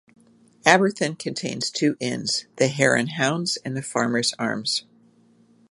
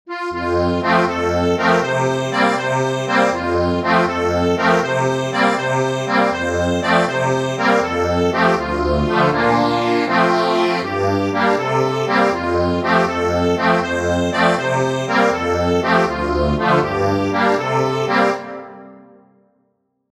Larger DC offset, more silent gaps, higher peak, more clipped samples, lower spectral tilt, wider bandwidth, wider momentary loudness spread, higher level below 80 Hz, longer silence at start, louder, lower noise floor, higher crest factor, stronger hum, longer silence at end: neither; neither; about the same, 0 dBFS vs -2 dBFS; neither; second, -3.5 dB/octave vs -5.5 dB/octave; second, 11.5 kHz vs 14 kHz; first, 9 LU vs 3 LU; second, -66 dBFS vs -38 dBFS; first, 0.65 s vs 0.05 s; second, -23 LUFS vs -17 LUFS; second, -57 dBFS vs -67 dBFS; first, 24 dB vs 16 dB; neither; second, 0.9 s vs 1.15 s